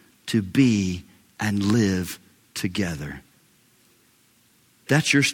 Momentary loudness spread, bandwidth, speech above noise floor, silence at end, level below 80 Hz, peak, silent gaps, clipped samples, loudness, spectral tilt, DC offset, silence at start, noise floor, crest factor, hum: 17 LU; 17.5 kHz; 38 dB; 0 s; -56 dBFS; -6 dBFS; none; under 0.1%; -23 LUFS; -5 dB/octave; under 0.1%; 0.25 s; -60 dBFS; 20 dB; none